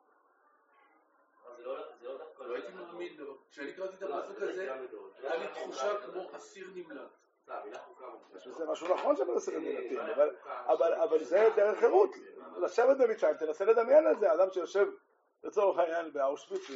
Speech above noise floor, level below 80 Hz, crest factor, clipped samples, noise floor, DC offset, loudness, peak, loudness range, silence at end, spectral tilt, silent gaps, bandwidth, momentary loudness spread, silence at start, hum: 38 dB; under -90 dBFS; 20 dB; under 0.1%; -69 dBFS; under 0.1%; -31 LUFS; -12 dBFS; 15 LU; 0 s; -2 dB/octave; none; 7.6 kHz; 21 LU; 1.45 s; none